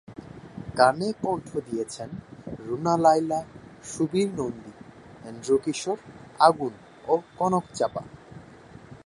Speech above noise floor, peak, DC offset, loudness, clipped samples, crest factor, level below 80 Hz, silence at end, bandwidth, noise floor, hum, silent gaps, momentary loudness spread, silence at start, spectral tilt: 23 dB; -4 dBFS; under 0.1%; -25 LUFS; under 0.1%; 24 dB; -60 dBFS; 0.1 s; 11.5 kHz; -48 dBFS; none; none; 23 LU; 0.1 s; -5.5 dB/octave